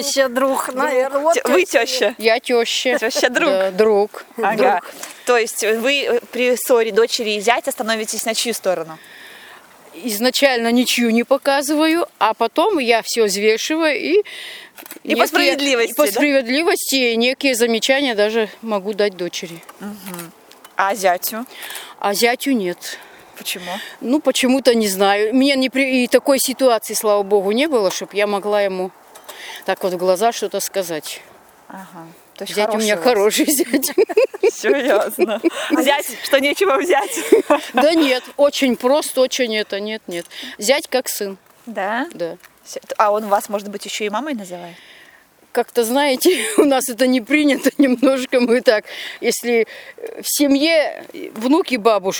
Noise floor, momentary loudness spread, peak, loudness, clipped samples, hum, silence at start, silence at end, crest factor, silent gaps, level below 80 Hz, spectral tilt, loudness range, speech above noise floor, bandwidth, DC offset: -49 dBFS; 14 LU; 0 dBFS; -17 LUFS; under 0.1%; none; 0 s; 0 s; 18 dB; none; -66 dBFS; -2.5 dB/octave; 6 LU; 32 dB; over 20 kHz; under 0.1%